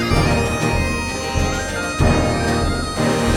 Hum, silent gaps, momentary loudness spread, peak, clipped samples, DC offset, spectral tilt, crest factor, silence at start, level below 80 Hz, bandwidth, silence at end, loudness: none; none; 5 LU; -4 dBFS; under 0.1%; under 0.1%; -5 dB/octave; 14 dB; 0 s; -26 dBFS; 18 kHz; 0 s; -19 LUFS